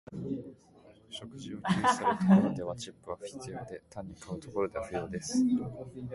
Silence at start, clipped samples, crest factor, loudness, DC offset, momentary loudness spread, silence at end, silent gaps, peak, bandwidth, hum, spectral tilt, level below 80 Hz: 0.1 s; under 0.1%; 20 dB; -31 LUFS; under 0.1%; 19 LU; 0 s; none; -12 dBFS; 11.5 kHz; none; -6 dB/octave; -60 dBFS